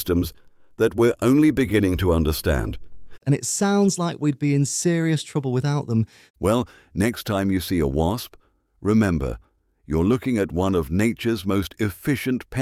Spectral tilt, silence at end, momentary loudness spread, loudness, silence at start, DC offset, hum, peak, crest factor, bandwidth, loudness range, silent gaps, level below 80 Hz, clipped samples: -6 dB/octave; 0 s; 8 LU; -22 LUFS; 0 s; under 0.1%; none; -6 dBFS; 16 dB; 16.5 kHz; 3 LU; 6.30-6.34 s; -38 dBFS; under 0.1%